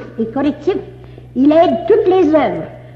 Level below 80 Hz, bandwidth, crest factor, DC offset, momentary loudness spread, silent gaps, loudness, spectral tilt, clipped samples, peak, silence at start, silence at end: -44 dBFS; 6.8 kHz; 12 dB; under 0.1%; 12 LU; none; -14 LUFS; -8 dB/octave; under 0.1%; -2 dBFS; 0 s; 0 s